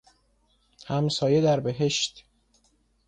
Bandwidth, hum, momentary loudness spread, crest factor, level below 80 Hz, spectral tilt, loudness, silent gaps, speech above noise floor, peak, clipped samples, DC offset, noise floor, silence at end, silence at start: 9.6 kHz; none; 8 LU; 16 dB; -60 dBFS; -5 dB/octave; -25 LUFS; none; 43 dB; -12 dBFS; under 0.1%; under 0.1%; -67 dBFS; 0.9 s; 0.85 s